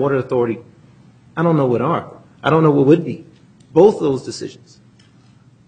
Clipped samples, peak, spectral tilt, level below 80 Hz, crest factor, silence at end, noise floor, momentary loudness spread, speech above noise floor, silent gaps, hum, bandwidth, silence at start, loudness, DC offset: under 0.1%; 0 dBFS; -8 dB/octave; -56 dBFS; 18 dB; 1.15 s; -49 dBFS; 17 LU; 33 dB; none; none; 9.4 kHz; 0 s; -16 LUFS; under 0.1%